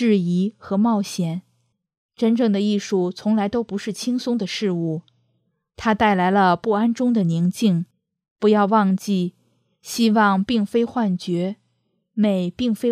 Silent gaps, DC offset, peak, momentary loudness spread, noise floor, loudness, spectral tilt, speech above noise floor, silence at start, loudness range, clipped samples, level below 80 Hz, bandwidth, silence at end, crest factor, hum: 1.97-2.09 s, 8.31-8.36 s; under 0.1%; -4 dBFS; 9 LU; -70 dBFS; -21 LUFS; -6.5 dB/octave; 50 dB; 0 s; 3 LU; under 0.1%; -58 dBFS; 14.5 kHz; 0 s; 16 dB; none